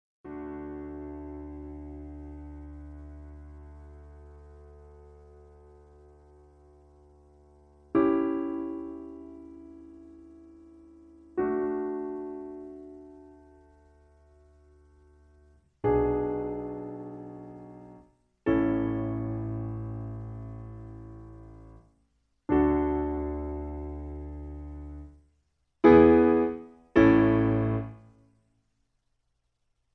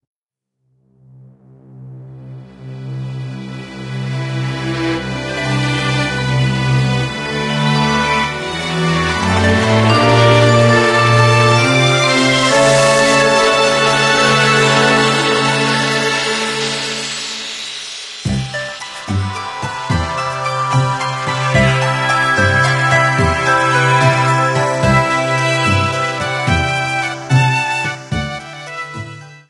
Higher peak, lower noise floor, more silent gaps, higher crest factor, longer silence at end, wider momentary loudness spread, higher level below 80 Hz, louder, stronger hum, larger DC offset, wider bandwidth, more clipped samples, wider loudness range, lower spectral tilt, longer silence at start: second, -8 dBFS vs 0 dBFS; about the same, -77 dBFS vs -76 dBFS; neither; first, 24 dB vs 14 dB; first, 1.95 s vs 0.1 s; first, 26 LU vs 15 LU; second, -46 dBFS vs -38 dBFS; second, -27 LUFS vs -14 LUFS; neither; neither; second, 5.6 kHz vs 12 kHz; neither; first, 21 LU vs 11 LU; first, -10 dB/octave vs -4.5 dB/octave; second, 0.25 s vs 1.7 s